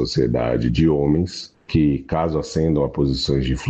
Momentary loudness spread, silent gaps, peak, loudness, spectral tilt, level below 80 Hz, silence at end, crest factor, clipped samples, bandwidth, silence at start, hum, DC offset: 4 LU; none; -6 dBFS; -20 LUFS; -7 dB/octave; -34 dBFS; 0 s; 12 dB; under 0.1%; 8.4 kHz; 0 s; none; under 0.1%